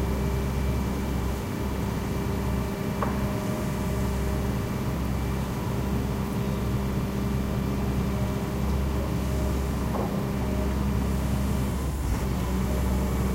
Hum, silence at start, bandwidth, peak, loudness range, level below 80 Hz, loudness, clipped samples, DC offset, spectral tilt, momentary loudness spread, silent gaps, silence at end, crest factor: none; 0 s; 16 kHz; -12 dBFS; 1 LU; -32 dBFS; -28 LUFS; under 0.1%; under 0.1%; -6.5 dB/octave; 2 LU; none; 0 s; 14 dB